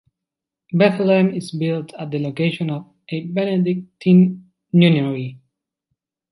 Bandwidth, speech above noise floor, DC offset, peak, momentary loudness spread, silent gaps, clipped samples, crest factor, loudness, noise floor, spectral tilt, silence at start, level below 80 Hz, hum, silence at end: 11.5 kHz; 67 dB; under 0.1%; -2 dBFS; 14 LU; none; under 0.1%; 18 dB; -19 LUFS; -85 dBFS; -8 dB/octave; 0.7 s; -64 dBFS; none; 0.95 s